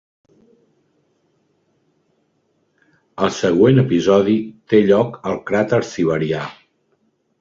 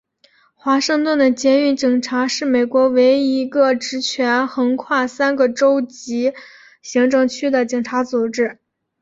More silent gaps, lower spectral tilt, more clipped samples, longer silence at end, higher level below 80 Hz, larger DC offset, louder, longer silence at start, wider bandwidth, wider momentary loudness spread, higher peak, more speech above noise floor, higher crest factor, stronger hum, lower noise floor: neither; first, -7 dB/octave vs -3 dB/octave; neither; first, 0.9 s vs 0.5 s; first, -54 dBFS vs -64 dBFS; neither; about the same, -17 LUFS vs -17 LUFS; first, 3.2 s vs 0.65 s; about the same, 7.6 kHz vs 7.8 kHz; first, 11 LU vs 7 LU; about the same, -2 dBFS vs -4 dBFS; first, 49 dB vs 40 dB; about the same, 18 dB vs 14 dB; neither; first, -65 dBFS vs -56 dBFS